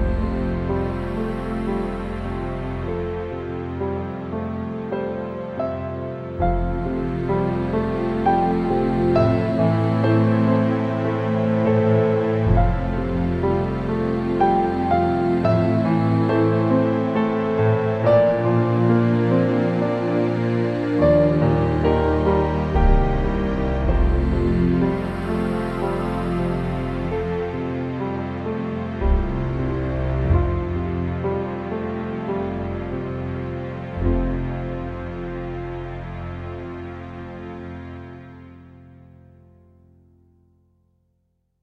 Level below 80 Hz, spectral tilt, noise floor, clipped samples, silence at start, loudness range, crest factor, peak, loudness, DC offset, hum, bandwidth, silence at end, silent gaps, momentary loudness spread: -30 dBFS; -9.5 dB/octave; -69 dBFS; under 0.1%; 0 s; 9 LU; 16 dB; -4 dBFS; -22 LUFS; under 0.1%; none; 8.4 kHz; 2.8 s; none; 12 LU